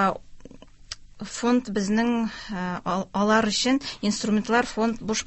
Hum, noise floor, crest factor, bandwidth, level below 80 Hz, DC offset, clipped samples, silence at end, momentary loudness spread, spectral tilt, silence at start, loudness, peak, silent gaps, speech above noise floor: none; -46 dBFS; 16 dB; 8.4 kHz; -52 dBFS; under 0.1%; under 0.1%; 0 s; 16 LU; -4 dB/octave; 0 s; -24 LUFS; -8 dBFS; none; 21 dB